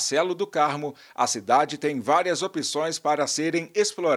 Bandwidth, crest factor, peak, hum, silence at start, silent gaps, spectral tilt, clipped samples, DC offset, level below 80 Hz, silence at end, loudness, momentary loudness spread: 15.5 kHz; 18 dB; -8 dBFS; none; 0 s; none; -3 dB/octave; under 0.1%; under 0.1%; -76 dBFS; 0 s; -24 LUFS; 5 LU